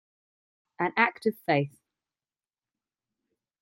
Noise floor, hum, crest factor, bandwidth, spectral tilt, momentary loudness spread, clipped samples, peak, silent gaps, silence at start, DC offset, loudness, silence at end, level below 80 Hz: under -90 dBFS; none; 26 dB; 16 kHz; -7 dB/octave; 7 LU; under 0.1%; -8 dBFS; none; 0.8 s; under 0.1%; -27 LUFS; 1.95 s; -78 dBFS